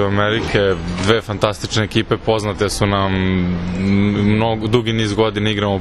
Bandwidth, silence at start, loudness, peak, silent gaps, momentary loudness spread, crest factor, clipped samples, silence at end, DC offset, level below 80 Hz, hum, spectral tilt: 12.5 kHz; 0 s; -17 LUFS; 0 dBFS; none; 4 LU; 16 dB; under 0.1%; 0 s; under 0.1%; -34 dBFS; none; -5.5 dB/octave